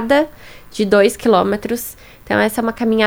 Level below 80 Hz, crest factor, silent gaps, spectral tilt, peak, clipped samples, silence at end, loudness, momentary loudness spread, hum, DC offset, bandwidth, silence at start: -46 dBFS; 16 dB; none; -4.5 dB/octave; 0 dBFS; under 0.1%; 0 s; -16 LUFS; 11 LU; none; under 0.1%; over 20 kHz; 0 s